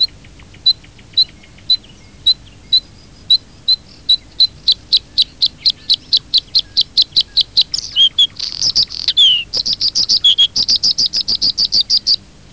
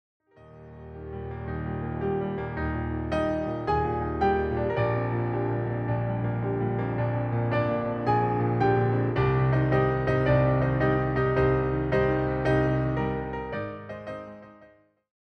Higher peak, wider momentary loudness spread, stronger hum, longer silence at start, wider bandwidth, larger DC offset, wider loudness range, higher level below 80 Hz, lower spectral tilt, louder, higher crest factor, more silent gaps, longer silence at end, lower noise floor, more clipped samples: first, -2 dBFS vs -10 dBFS; second, 6 LU vs 12 LU; neither; second, 0 s vs 0.45 s; first, 8 kHz vs 6 kHz; first, 0.4% vs under 0.1%; about the same, 4 LU vs 6 LU; about the same, -46 dBFS vs -42 dBFS; second, 0.5 dB/octave vs -9.5 dB/octave; first, -12 LUFS vs -26 LUFS; about the same, 12 dB vs 16 dB; neither; second, 0.35 s vs 0.55 s; second, -40 dBFS vs -57 dBFS; neither